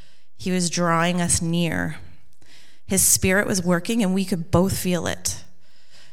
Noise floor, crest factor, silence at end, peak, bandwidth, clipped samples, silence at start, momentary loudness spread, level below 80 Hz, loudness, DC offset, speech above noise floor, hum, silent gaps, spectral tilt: -57 dBFS; 20 dB; 0.7 s; -4 dBFS; 17 kHz; under 0.1%; 0.4 s; 11 LU; -44 dBFS; -21 LUFS; 2%; 36 dB; none; none; -4 dB/octave